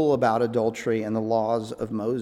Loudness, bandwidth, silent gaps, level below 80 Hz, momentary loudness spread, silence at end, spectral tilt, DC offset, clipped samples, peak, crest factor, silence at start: -25 LUFS; 14 kHz; none; -60 dBFS; 6 LU; 0 s; -7 dB/octave; under 0.1%; under 0.1%; -8 dBFS; 16 dB; 0 s